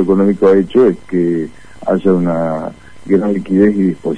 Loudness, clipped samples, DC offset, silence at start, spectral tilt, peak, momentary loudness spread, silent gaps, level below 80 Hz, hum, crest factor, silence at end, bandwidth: -13 LUFS; under 0.1%; 2%; 0 s; -9 dB/octave; 0 dBFS; 11 LU; none; -46 dBFS; none; 12 dB; 0 s; 10 kHz